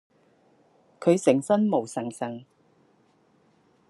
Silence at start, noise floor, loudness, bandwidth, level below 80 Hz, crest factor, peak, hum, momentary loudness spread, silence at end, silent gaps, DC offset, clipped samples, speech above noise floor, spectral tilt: 1 s; -63 dBFS; -25 LUFS; 12 kHz; -80 dBFS; 22 dB; -6 dBFS; none; 13 LU; 1.5 s; none; under 0.1%; under 0.1%; 40 dB; -6.5 dB/octave